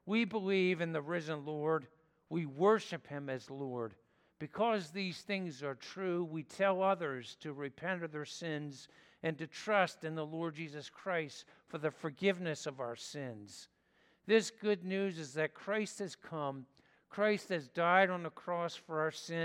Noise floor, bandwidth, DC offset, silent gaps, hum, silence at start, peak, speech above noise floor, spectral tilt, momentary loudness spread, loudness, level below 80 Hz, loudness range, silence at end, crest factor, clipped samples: -72 dBFS; 14 kHz; under 0.1%; none; none; 0.05 s; -14 dBFS; 35 dB; -5 dB/octave; 13 LU; -37 LUFS; -84 dBFS; 4 LU; 0 s; 24 dB; under 0.1%